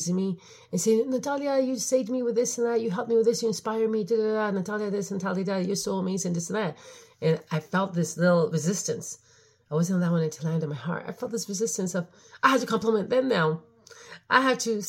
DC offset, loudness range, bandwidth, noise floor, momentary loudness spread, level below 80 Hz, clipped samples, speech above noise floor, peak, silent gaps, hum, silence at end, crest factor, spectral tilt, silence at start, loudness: under 0.1%; 3 LU; 16.5 kHz; -48 dBFS; 10 LU; -72 dBFS; under 0.1%; 22 dB; -6 dBFS; none; none; 0 s; 22 dB; -5 dB/octave; 0 s; -27 LUFS